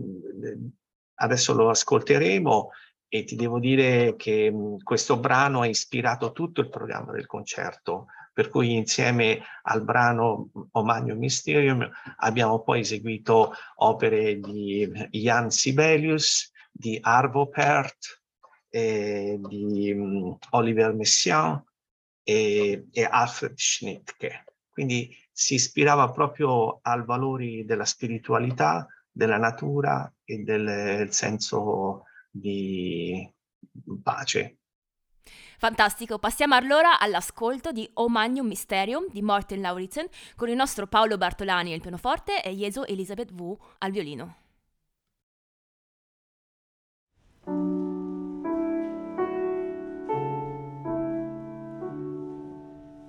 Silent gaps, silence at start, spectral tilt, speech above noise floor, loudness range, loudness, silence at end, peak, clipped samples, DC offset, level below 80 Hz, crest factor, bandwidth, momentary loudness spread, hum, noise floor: 0.95-1.17 s, 21.91-22.25 s, 33.55-33.61 s, 34.75-34.82 s, 45.23-47.07 s; 0 s; -4 dB/octave; 54 dB; 9 LU; -25 LUFS; 0 s; -6 dBFS; under 0.1%; under 0.1%; -58 dBFS; 20 dB; 19.5 kHz; 15 LU; none; -78 dBFS